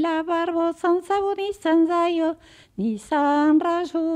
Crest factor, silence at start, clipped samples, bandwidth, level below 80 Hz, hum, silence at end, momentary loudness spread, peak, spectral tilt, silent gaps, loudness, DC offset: 12 dB; 0 s; under 0.1%; 10.5 kHz; -60 dBFS; none; 0 s; 9 LU; -10 dBFS; -5.5 dB/octave; none; -22 LUFS; under 0.1%